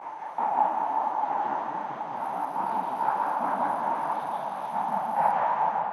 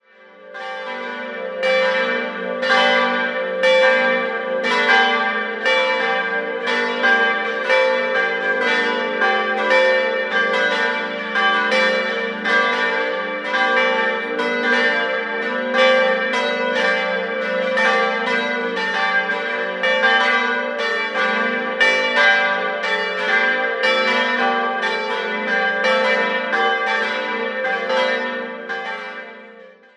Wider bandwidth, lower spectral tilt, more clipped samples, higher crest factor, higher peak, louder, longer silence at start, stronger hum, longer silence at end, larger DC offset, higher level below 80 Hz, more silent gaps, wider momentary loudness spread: first, 12.5 kHz vs 10.5 kHz; first, -5.5 dB/octave vs -3 dB/octave; neither; about the same, 16 dB vs 18 dB; second, -12 dBFS vs -2 dBFS; second, -28 LUFS vs -18 LUFS; second, 0 s vs 0.4 s; neither; second, 0 s vs 0.25 s; neither; second, -88 dBFS vs -72 dBFS; neither; about the same, 7 LU vs 8 LU